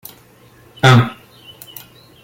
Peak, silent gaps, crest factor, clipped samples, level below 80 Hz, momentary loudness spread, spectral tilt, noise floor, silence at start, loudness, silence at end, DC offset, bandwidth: -2 dBFS; none; 18 dB; under 0.1%; -52 dBFS; 26 LU; -6 dB/octave; -47 dBFS; 0.85 s; -13 LUFS; 1.1 s; under 0.1%; 17 kHz